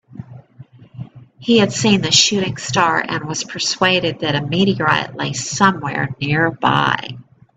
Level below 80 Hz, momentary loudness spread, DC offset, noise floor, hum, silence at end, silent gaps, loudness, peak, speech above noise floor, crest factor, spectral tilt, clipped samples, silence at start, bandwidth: -52 dBFS; 18 LU; under 0.1%; -43 dBFS; none; 0.35 s; none; -16 LUFS; 0 dBFS; 26 dB; 18 dB; -3.5 dB/octave; under 0.1%; 0.15 s; 9.2 kHz